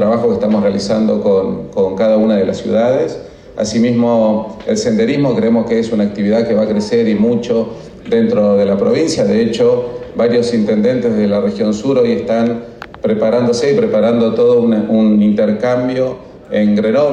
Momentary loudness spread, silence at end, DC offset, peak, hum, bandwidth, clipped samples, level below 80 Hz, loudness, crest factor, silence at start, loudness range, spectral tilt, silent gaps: 6 LU; 0 s; under 0.1%; -4 dBFS; none; 9.4 kHz; under 0.1%; -46 dBFS; -14 LUFS; 10 dB; 0 s; 2 LU; -6.5 dB/octave; none